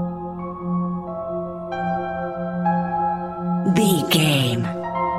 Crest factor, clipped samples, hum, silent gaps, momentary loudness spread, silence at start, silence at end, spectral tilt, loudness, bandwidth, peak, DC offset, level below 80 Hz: 18 dB; under 0.1%; none; none; 11 LU; 0 s; 0 s; -5.5 dB/octave; -22 LUFS; 16 kHz; -4 dBFS; under 0.1%; -50 dBFS